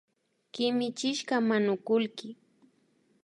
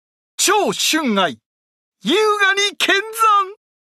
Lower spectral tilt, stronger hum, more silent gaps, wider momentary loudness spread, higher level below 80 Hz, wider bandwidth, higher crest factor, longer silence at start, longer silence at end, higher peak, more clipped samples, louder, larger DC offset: first, -4.5 dB/octave vs -1.5 dB/octave; neither; second, none vs 1.46-1.92 s; first, 17 LU vs 7 LU; second, -84 dBFS vs -70 dBFS; second, 11.5 kHz vs 16 kHz; about the same, 16 dB vs 16 dB; first, 0.55 s vs 0.4 s; first, 0.9 s vs 0.3 s; second, -14 dBFS vs -2 dBFS; neither; second, -29 LUFS vs -16 LUFS; neither